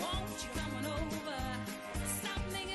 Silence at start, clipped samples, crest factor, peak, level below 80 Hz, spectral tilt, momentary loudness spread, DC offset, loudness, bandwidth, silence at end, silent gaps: 0 s; under 0.1%; 14 dB; -26 dBFS; -46 dBFS; -3.5 dB/octave; 3 LU; under 0.1%; -39 LUFS; 12.5 kHz; 0 s; none